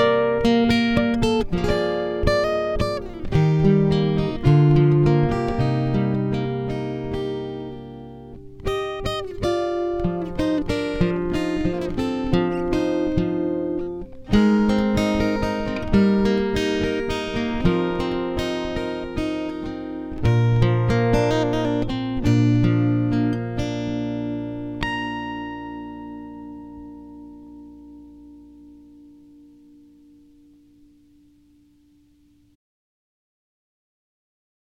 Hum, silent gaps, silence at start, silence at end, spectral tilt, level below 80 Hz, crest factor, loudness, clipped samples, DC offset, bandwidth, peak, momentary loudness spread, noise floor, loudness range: none; none; 0 s; 5.95 s; -7.5 dB/octave; -36 dBFS; 18 dB; -22 LUFS; under 0.1%; under 0.1%; 12 kHz; -4 dBFS; 16 LU; -57 dBFS; 11 LU